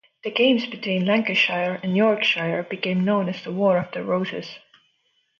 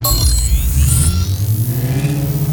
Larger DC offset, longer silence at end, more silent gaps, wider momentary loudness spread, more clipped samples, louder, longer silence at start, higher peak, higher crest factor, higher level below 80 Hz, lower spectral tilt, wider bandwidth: neither; first, 0.8 s vs 0 s; neither; first, 8 LU vs 4 LU; neither; second, -22 LUFS vs -15 LUFS; first, 0.25 s vs 0 s; second, -6 dBFS vs 0 dBFS; about the same, 18 dB vs 14 dB; second, -70 dBFS vs -18 dBFS; first, -6.5 dB/octave vs -4.5 dB/octave; second, 7 kHz vs over 20 kHz